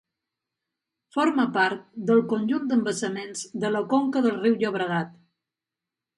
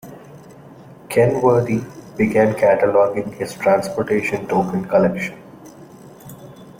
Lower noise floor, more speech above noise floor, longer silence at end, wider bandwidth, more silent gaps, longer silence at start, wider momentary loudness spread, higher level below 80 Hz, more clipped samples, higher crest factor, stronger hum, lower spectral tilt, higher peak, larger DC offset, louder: first, -89 dBFS vs -41 dBFS; first, 65 dB vs 24 dB; first, 1.05 s vs 0.05 s; second, 11.5 kHz vs 16.5 kHz; neither; first, 1.15 s vs 0.05 s; second, 9 LU vs 24 LU; second, -74 dBFS vs -54 dBFS; neither; about the same, 18 dB vs 16 dB; neither; second, -5 dB/octave vs -7 dB/octave; second, -8 dBFS vs -4 dBFS; neither; second, -25 LUFS vs -18 LUFS